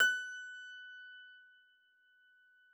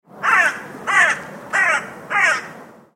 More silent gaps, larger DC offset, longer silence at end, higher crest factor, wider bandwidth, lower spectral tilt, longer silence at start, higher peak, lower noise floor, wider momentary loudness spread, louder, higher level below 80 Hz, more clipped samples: neither; neither; first, 1.3 s vs 0.3 s; first, 24 dB vs 18 dB; first, over 20 kHz vs 16.5 kHz; second, 3 dB/octave vs -1.5 dB/octave; second, 0 s vs 0.15 s; second, -18 dBFS vs -2 dBFS; first, -70 dBFS vs -39 dBFS; first, 22 LU vs 10 LU; second, -40 LUFS vs -17 LUFS; second, under -90 dBFS vs -66 dBFS; neither